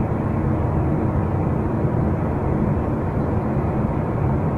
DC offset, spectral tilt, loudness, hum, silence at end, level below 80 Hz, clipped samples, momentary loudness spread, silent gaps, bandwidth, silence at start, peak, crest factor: under 0.1%; -11 dB/octave; -22 LUFS; none; 0 s; -30 dBFS; under 0.1%; 1 LU; none; 4.4 kHz; 0 s; -8 dBFS; 12 dB